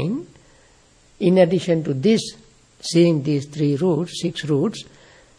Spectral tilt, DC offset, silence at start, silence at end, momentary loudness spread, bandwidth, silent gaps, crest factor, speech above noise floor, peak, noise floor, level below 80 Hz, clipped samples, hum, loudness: -6.5 dB/octave; under 0.1%; 0 s; 0.55 s; 11 LU; 10.5 kHz; none; 18 dB; 35 dB; -4 dBFS; -54 dBFS; -58 dBFS; under 0.1%; none; -20 LUFS